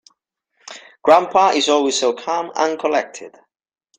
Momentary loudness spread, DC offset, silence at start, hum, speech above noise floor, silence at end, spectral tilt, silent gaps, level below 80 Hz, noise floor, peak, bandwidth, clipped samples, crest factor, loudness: 23 LU; under 0.1%; 0.7 s; none; 51 dB; 0.7 s; -2 dB/octave; none; -66 dBFS; -68 dBFS; 0 dBFS; 9.6 kHz; under 0.1%; 18 dB; -17 LUFS